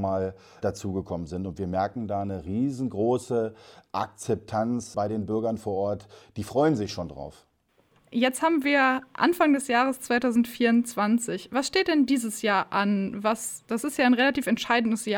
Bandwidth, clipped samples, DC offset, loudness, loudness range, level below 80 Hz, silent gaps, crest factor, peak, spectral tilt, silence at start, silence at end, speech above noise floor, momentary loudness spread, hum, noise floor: 18 kHz; under 0.1%; under 0.1%; -26 LUFS; 6 LU; -58 dBFS; none; 18 dB; -8 dBFS; -5 dB/octave; 0 s; 0 s; 40 dB; 11 LU; none; -66 dBFS